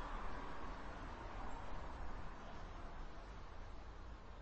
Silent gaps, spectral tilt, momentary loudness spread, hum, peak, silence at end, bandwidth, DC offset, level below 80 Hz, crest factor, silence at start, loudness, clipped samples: none; -6 dB/octave; 6 LU; none; -34 dBFS; 0 s; 8.4 kHz; under 0.1%; -52 dBFS; 14 dB; 0 s; -53 LUFS; under 0.1%